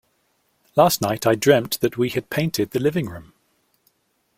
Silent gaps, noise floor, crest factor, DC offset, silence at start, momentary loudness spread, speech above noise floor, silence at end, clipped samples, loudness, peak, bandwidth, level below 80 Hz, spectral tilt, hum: none; -67 dBFS; 20 dB; under 0.1%; 0.75 s; 8 LU; 47 dB; 1.15 s; under 0.1%; -20 LUFS; -2 dBFS; 16.5 kHz; -56 dBFS; -5 dB/octave; none